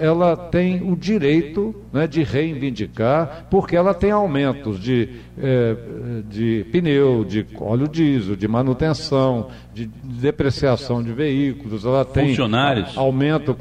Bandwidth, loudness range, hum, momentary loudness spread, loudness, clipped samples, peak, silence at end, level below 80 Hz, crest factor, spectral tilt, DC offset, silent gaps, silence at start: 9.8 kHz; 2 LU; 60 Hz at -40 dBFS; 8 LU; -20 LUFS; under 0.1%; -6 dBFS; 0 s; -42 dBFS; 14 dB; -7.5 dB/octave; under 0.1%; none; 0 s